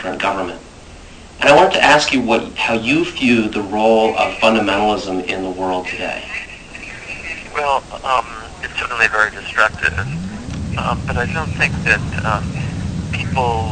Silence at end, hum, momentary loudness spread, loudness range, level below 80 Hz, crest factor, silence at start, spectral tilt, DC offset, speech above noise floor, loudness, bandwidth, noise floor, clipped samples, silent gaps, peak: 0 s; none; 14 LU; 8 LU; -36 dBFS; 18 dB; 0 s; -5 dB/octave; under 0.1%; 21 dB; -17 LUFS; 9.4 kHz; -37 dBFS; under 0.1%; none; 0 dBFS